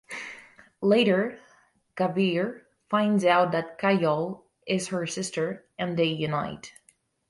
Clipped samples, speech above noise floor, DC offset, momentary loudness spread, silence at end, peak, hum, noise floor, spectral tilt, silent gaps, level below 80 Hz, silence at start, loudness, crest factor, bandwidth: under 0.1%; 39 dB; under 0.1%; 16 LU; 0.6 s; -8 dBFS; none; -65 dBFS; -5.5 dB/octave; none; -68 dBFS; 0.1 s; -26 LUFS; 18 dB; 11.5 kHz